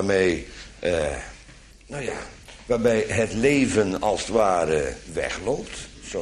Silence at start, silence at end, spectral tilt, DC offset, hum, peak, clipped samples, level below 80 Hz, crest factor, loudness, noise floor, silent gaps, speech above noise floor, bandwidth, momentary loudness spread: 0 s; 0 s; -5 dB/octave; under 0.1%; none; -6 dBFS; under 0.1%; -44 dBFS; 18 dB; -24 LUFS; -47 dBFS; none; 24 dB; 13 kHz; 16 LU